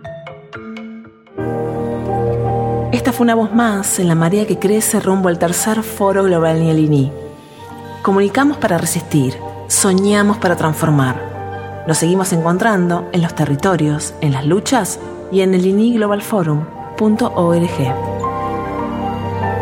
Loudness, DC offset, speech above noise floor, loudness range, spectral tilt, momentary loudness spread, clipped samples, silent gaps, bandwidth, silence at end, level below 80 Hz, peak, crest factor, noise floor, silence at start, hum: -15 LUFS; under 0.1%; 21 dB; 3 LU; -5.5 dB/octave; 13 LU; under 0.1%; none; 17.5 kHz; 0 s; -44 dBFS; 0 dBFS; 16 dB; -35 dBFS; 0 s; none